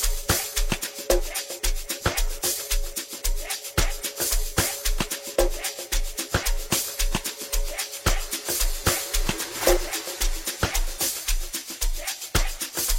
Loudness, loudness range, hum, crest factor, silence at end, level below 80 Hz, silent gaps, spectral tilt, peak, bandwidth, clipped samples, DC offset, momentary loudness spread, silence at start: -26 LUFS; 2 LU; none; 20 dB; 0 s; -28 dBFS; none; -2.5 dB/octave; -6 dBFS; 16.5 kHz; under 0.1%; under 0.1%; 6 LU; 0 s